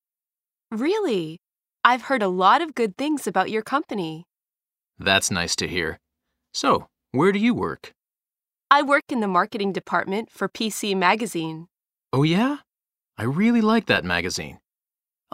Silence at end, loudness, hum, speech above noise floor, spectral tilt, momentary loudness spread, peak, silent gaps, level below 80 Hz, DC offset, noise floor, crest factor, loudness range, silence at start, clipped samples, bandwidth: 0.8 s; -22 LUFS; none; over 68 dB; -4.5 dB/octave; 11 LU; 0 dBFS; none; -58 dBFS; under 0.1%; under -90 dBFS; 24 dB; 2 LU; 0.7 s; under 0.1%; 16 kHz